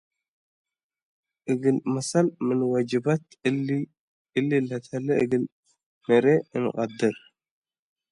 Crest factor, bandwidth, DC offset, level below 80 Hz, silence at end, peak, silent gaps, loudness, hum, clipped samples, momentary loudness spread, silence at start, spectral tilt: 20 dB; 11.5 kHz; under 0.1%; -70 dBFS; 0.95 s; -8 dBFS; 3.99-4.25 s, 5.52-5.63 s, 5.83-6.01 s; -25 LUFS; none; under 0.1%; 8 LU; 1.45 s; -6.5 dB/octave